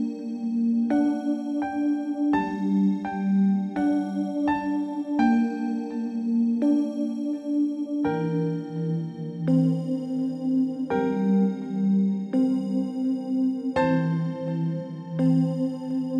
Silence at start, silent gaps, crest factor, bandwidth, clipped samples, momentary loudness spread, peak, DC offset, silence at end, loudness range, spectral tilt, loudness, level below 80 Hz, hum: 0 s; none; 14 dB; 9.2 kHz; under 0.1%; 6 LU; -10 dBFS; under 0.1%; 0 s; 2 LU; -9 dB/octave; -25 LUFS; -62 dBFS; none